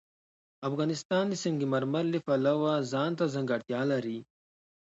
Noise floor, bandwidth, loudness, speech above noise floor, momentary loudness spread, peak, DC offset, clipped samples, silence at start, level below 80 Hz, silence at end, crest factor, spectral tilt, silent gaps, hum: under -90 dBFS; 8.2 kHz; -30 LUFS; over 61 dB; 6 LU; -16 dBFS; under 0.1%; under 0.1%; 0.6 s; -76 dBFS; 0.6 s; 14 dB; -6 dB/octave; 1.05-1.10 s; none